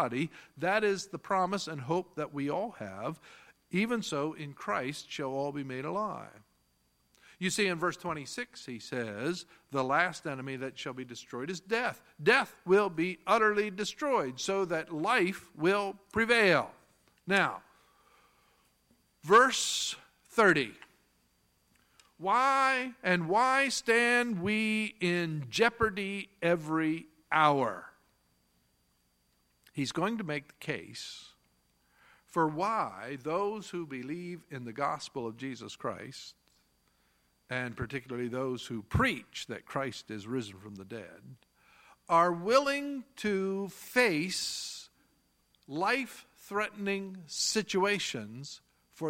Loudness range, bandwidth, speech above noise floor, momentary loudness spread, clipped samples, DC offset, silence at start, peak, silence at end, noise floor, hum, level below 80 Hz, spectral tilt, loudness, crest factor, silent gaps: 9 LU; 16.5 kHz; 41 dB; 15 LU; under 0.1%; under 0.1%; 0 s; -10 dBFS; 0 s; -73 dBFS; none; -62 dBFS; -4 dB/octave; -31 LUFS; 22 dB; none